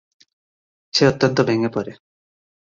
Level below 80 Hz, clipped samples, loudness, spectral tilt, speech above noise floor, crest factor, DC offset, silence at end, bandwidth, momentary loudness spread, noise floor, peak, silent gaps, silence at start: -56 dBFS; under 0.1%; -19 LUFS; -5.5 dB/octave; over 72 dB; 20 dB; under 0.1%; 0.75 s; 7.6 kHz; 11 LU; under -90 dBFS; -2 dBFS; none; 0.95 s